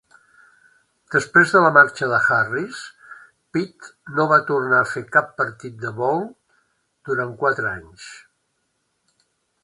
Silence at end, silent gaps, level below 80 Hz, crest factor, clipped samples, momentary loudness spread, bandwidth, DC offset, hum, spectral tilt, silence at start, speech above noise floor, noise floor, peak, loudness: 1.45 s; none; -62 dBFS; 22 dB; under 0.1%; 21 LU; 11.5 kHz; under 0.1%; none; -5.5 dB/octave; 1.1 s; 52 dB; -71 dBFS; 0 dBFS; -19 LUFS